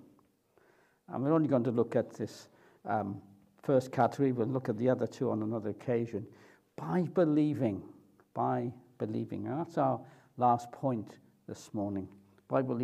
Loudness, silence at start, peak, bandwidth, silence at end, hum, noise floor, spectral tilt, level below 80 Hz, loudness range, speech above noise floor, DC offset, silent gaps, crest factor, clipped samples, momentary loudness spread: -33 LUFS; 1.1 s; -14 dBFS; 13.5 kHz; 0 s; none; -68 dBFS; -8.5 dB/octave; -78 dBFS; 2 LU; 36 dB; under 0.1%; none; 20 dB; under 0.1%; 16 LU